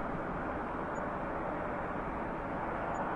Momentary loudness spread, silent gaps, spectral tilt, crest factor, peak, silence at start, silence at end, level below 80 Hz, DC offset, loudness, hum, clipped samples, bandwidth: 1 LU; none; -7.5 dB/octave; 14 dB; -24 dBFS; 0 s; 0 s; -50 dBFS; under 0.1%; -37 LUFS; none; under 0.1%; 11 kHz